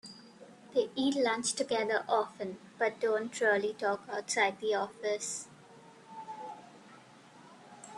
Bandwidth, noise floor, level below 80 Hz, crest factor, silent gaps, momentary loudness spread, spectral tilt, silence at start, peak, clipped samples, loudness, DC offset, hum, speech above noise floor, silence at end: 12 kHz; -56 dBFS; -80 dBFS; 22 dB; none; 19 LU; -2.5 dB/octave; 0.05 s; -14 dBFS; under 0.1%; -32 LUFS; under 0.1%; none; 24 dB; 0 s